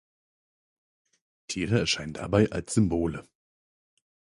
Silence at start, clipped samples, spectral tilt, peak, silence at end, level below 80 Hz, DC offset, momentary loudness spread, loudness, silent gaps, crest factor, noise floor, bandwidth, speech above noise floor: 1.5 s; under 0.1%; -5 dB/octave; -8 dBFS; 1.1 s; -50 dBFS; under 0.1%; 8 LU; -27 LUFS; none; 22 dB; under -90 dBFS; 11.5 kHz; over 64 dB